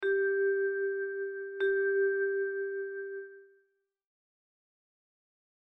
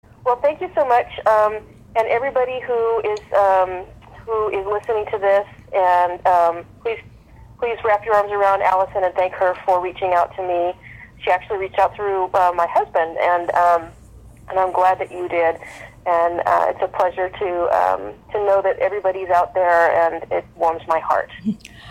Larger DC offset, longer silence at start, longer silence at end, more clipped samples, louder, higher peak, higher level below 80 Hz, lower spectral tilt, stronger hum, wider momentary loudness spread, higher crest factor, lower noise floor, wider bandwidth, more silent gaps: neither; second, 0 s vs 0.25 s; first, 2.15 s vs 0 s; neither; second, -32 LUFS vs -19 LUFS; second, -22 dBFS vs -2 dBFS; second, -80 dBFS vs -50 dBFS; second, -1 dB/octave vs -5.5 dB/octave; neither; about the same, 11 LU vs 10 LU; about the same, 12 dB vs 16 dB; first, -75 dBFS vs -44 dBFS; second, 3.9 kHz vs 15.5 kHz; neither